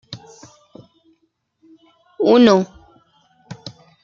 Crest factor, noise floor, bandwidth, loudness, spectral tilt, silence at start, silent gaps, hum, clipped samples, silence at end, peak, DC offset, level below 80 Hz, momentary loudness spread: 20 dB; -67 dBFS; 7.4 kHz; -15 LUFS; -6 dB/octave; 0.1 s; none; none; under 0.1%; 0.35 s; 0 dBFS; under 0.1%; -60 dBFS; 26 LU